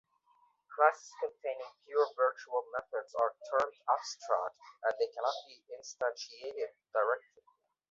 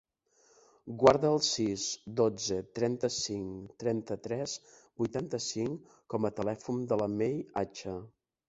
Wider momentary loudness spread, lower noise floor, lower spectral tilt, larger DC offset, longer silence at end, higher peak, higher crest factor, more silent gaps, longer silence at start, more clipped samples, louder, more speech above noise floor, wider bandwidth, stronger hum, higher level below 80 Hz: about the same, 13 LU vs 14 LU; about the same, -71 dBFS vs -68 dBFS; second, 2 dB/octave vs -4.5 dB/octave; neither; first, 0.7 s vs 0.4 s; second, -12 dBFS vs -6 dBFS; about the same, 24 dB vs 26 dB; neither; second, 0.7 s vs 0.85 s; neither; second, -35 LUFS vs -32 LUFS; about the same, 36 dB vs 36 dB; about the same, 7.8 kHz vs 8.2 kHz; neither; second, -84 dBFS vs -64 dBFS